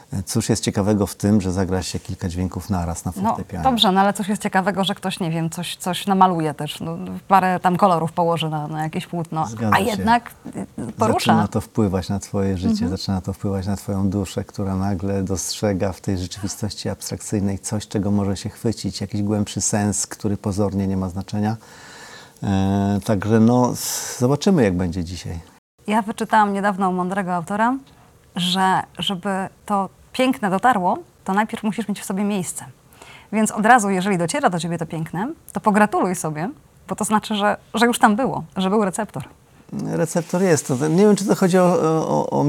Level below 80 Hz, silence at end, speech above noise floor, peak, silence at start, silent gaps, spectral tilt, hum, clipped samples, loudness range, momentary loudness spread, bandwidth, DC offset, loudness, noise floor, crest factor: -48 dBFS; 0 s; 24 dB; 0 dBFS; 0.1 s; 25.58-25.78 s; -5 dB/octave; none; under 0.1%; 4 LU; 11 LU; 16.5 kHz; under 0.1%; -21 LUFS; -45 dBFS; 20 dB